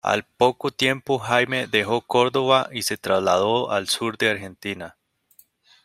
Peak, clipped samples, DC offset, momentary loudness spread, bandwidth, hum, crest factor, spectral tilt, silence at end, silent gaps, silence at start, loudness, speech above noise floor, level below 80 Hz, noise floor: -2 dBFS; under 0.1%; under 0.1%; 10 LU; 16 kHz; none; 20 dB; -3.5 dB/octave; 0.95 s; none; 0.05 s; -22 LUFS; 35 dB; -64 dBFS; -57 dBFS